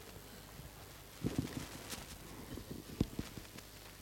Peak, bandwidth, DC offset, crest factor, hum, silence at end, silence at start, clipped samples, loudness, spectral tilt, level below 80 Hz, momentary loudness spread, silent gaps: -20 dBFS; 16 kHz; under 0.1%; 26 dB; none; 0 s; 0 s; under 0.1%; -46 LUFS; -5 dB/octave; -56 dBFS; 12 LU; none